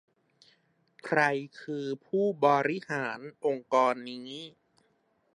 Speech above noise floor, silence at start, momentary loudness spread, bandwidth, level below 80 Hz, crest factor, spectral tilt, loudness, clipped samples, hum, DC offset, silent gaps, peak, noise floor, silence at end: 42 dB; 1.05 s; 16 LU; 10.5 kHz; -82 dBFS; 22 dB; -5.5 dB/octave; -29 LUFS; under 0.1%; none; under 0.1%; none; -10 dBFS; -72 dBFS; 0.85 s